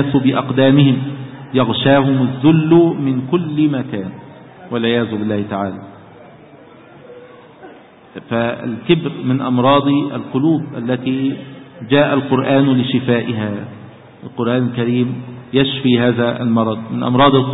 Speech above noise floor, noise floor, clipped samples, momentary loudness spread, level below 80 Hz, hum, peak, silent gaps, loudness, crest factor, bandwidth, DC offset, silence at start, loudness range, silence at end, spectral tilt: 26 dB; -41 dBFS; under 0.1%; 14 LU; -52 dBFS; none; 0 dBFS; none; -16 LUFS; 16 dB; 4 kHz; under 0.1%; 0 s; 9 LU; 0 s; -12 dB/octave